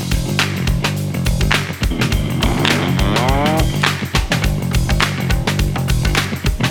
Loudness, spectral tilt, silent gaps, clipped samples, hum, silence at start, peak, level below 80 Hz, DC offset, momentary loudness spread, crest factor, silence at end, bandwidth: -17 LUFS; -5 dB/octave; none; under 0.1%; none; 0 s; 0 dBFS; -22 dBFS; under 0.1%; 3 LU; 16 dB; 0 s; 19 kHz